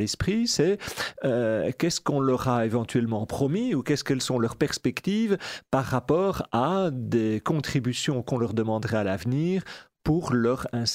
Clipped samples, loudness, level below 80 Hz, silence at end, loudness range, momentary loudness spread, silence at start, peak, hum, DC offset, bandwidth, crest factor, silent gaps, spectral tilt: under 0.1%; -26 LUFS; -52 dBFS; 0 s; 1 LU; 4 LU; 0 s; -10 dBFS; none; under 0.1%; 16 kHz; 16 dB; none; -5.5 dB/octave